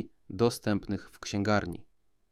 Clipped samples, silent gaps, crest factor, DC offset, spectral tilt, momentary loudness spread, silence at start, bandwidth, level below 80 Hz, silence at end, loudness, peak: under 0.1%; none; 20 dB; under 0.1%; -5.5 dB/octave; 13 LU; 0 s; 15.5 kHz; -56 dBFS; 0.5 s; -31 LUFS; -12 dBFS